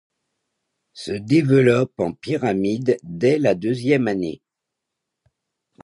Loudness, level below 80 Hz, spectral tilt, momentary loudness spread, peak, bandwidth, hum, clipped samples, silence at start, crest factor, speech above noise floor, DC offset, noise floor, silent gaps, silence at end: -20 LUFS; -58 dBFS; -7.5 dB/octave; 14 LU; -4 dBFS; 11 kHz; none; under 0.1%; 0.95 s; 18 dB; 63 dB; under 0.1%; -82 dBFS; none; 1.45 s